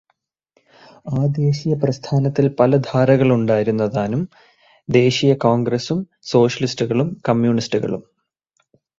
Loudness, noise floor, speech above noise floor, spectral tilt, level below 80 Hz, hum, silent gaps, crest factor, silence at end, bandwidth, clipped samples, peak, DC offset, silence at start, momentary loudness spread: -18 LUFS; -70 dBFS; 53 dB; -7 dB/octave; -54 dBFS; none; none; 18 dB; 1 s; 7.6 kHz; under 0.1%; 0 dBFS; under 0.1%; 1.05 s; 10 LU